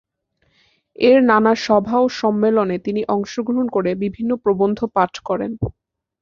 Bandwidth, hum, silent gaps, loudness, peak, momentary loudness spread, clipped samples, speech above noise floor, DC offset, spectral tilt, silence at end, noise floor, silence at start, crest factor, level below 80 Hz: 7.4 kHz; none; none; -18 LUFS; -2 dBFS; 9 LU; under 0.1%; 49 dB; under 0.1%; -6.5 dB/octave; 0.5 s; -66 dBFS; 1 s; 16 dB; -48 dBFS